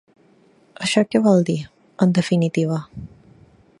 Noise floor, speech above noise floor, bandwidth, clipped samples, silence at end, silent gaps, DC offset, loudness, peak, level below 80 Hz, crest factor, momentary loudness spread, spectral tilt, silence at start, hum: -55 dBFS; 37 dB; 11.5 kHz; under 0.1%; 0.75 s; none; under 0.1%; -19 LUFS; -2 dBFS; -56 dBFS; 18 dB; 18 LU; -6 dB/octave; 0.8 s; none